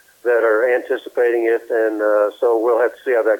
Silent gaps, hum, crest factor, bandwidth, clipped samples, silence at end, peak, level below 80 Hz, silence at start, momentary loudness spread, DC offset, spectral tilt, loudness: none; none; 12 dB; 17.5 kHz; under 0.1%; 0 s; -4 dBFS; -74 dBFS; 0.25 s; 4 LU; under 0.1%; -3.5 dB/octave; -17 LUFS